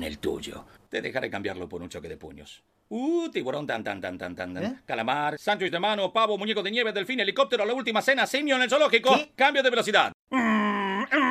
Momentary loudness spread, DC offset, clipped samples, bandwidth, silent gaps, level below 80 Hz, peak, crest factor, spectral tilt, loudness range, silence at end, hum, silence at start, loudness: 15 LU; under 0.1%; under 0.1%; 15 kHz; 10.14-10.27 s; -60 dBFS; -6 dBFS; 22 dB; -4 dB/octave; 10 LU; 0 s; none; 0 s; -25 LUFS